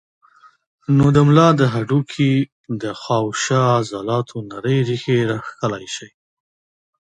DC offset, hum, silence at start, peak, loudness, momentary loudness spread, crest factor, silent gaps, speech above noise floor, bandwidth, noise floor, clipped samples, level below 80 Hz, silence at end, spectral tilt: under 0.1%; none; 0.9 s; 0 dBFS; -18 LUFS; 14 LU; 18 dB; 2.52-2.64 s; over 73 dB; 9.4 kHz; under -90 dBFS; under 0.1%; -50 dBFS; 0.95 s; -6.5 dB/octave